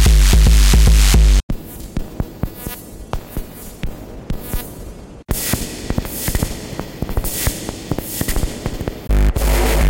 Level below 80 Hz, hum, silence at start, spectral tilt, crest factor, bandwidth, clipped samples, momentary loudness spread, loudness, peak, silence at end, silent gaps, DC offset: -16 dBFS; none; 0 s; -4.5 dB/octave; 16 dB; 17 kHz; under 0.1%; 18 LU; -18 LUFS; 0 dBFS; 0 s; 1.43-1.49 s; under 0.1%